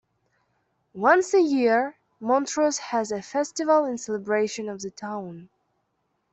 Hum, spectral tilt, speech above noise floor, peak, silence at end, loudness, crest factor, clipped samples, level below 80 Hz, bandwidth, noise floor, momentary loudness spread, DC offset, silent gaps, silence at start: none; -4 dB/octave; 51 dB; -6 dBFS; 0.85 s; -24 LUFS; 20 dB; under 0.1%; -72 dBFS; 8.4 kHz; -74 dBFS; 14 LU; under 0.1%; none; 0.95 s